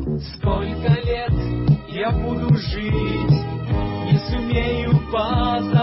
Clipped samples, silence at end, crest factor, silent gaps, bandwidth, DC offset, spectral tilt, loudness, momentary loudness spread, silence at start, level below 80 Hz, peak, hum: under 0.1%; 0 s; 16 dB; none; 5.8 kHz; under 0.1%; -11 dB/octave; -21 LUFS; 4 LU; 0 s; -30 dBFS; -4 dBFS; none